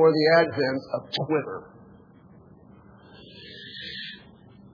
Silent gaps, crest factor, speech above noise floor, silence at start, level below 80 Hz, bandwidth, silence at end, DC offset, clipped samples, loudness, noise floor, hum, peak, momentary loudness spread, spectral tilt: none; 20 dB; 29 dB; 0 s; -66 dBFS; 5.4 kHz; 0.55 s; under 0.1%; under 0.1%; -25 LUFS; -52 dBFS; none; -8 dBFS; 24 LU; -6.5 dB/octave